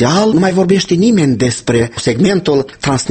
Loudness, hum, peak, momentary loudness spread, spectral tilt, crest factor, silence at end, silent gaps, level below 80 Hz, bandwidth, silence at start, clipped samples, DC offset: -12 LUFS; none; 0 dBFS; 5 LU; -5.5 dB/octave; 12 dB; 0 s; none; -42 dBFS; 8.8 kHz; 0 s; under 0.1%; under 0.1%